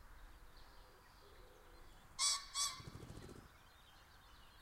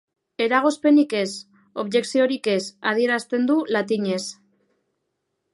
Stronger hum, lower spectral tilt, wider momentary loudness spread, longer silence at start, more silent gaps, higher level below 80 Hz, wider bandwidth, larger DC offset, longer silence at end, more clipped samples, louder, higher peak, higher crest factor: neither; second, 0 dB/octave vs -4.5 dB/octave; first, 27 LU vs 13 LU; second, 0 s vs 0.4 s; neither; first, -64 dBFS vs -76 dBFS; first, 16 kHz vs 11.5 kHz; neither; second, 0 s vs 1.2 s; neither; second, -40 LUFS vs -21 LUFS; second, -24 dBFS vs -4 dBFS; first, 26 dB vs 18 dB